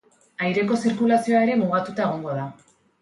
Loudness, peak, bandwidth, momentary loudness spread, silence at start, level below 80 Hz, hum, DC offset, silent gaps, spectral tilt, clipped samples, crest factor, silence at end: -22 LUFS; -8 dBFS; 11.5 kHz; 11 LU; 0.4 s; -68 dBFS; none; under 0.1%; none; -6.5 dB/octave; under 0.1%; 14 dB; 0.5 s